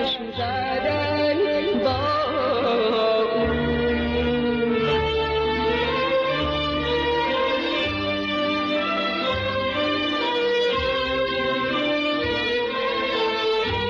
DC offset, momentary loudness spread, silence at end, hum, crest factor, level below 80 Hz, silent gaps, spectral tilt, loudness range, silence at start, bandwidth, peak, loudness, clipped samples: under 0.1%; 2 LU; 0 s; none; 10 dB; -40 dBFS; none; -6 dB/octave; 1 LU; 0 s; 7.2 kHz; -12 dBFS; -22 LUFS; under 0.1%